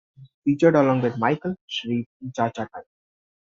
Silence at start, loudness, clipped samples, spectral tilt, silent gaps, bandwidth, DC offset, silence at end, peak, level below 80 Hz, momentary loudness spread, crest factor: 0.2 s; -23 LUFS; under 0.1%; -5.5 dB/octave; 0.34-0.42 s, 1.61-1.68 s, 2.06-2.20 s; 7.6 kHz; under 0.1%; 0.65 s; -4 dBFS; -64 dBFS; 16 LU; 20 dB